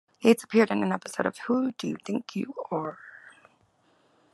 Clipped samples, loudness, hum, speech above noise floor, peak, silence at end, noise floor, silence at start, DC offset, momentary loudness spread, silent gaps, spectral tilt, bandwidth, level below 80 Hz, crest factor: under 0.1%; -27 LUFS; none; 39 dB; -6 dBFS; 1.15 s; -66 dBFS; 0.2 s; under 0.1%; 12 LU; none; -5.5 dB/octave; 13 kHz; -78 dBFS; 22 dB